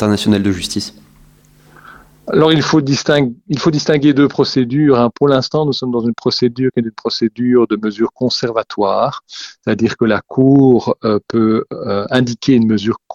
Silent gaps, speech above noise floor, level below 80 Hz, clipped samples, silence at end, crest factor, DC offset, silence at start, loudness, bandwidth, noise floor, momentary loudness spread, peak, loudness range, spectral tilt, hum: none; 33 dB; -48 dBFS; under 0.1%; 0 s; 14 dB; under 0.1%; 0 s; -14 LUFS; 12 kHz; -47 dBFS; 8 LU; 0 dBFS; 3 LU; -6 dB/octave; none